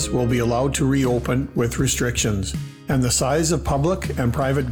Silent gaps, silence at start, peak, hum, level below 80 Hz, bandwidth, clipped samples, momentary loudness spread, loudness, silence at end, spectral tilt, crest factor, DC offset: none; 0 s; -10 dBFS; none; -34 dBFS; 20 kHz; under 0.1%; 5 LU; -21 LUFS; 0 s; -5 dB/octave; 10 dB; 0.2%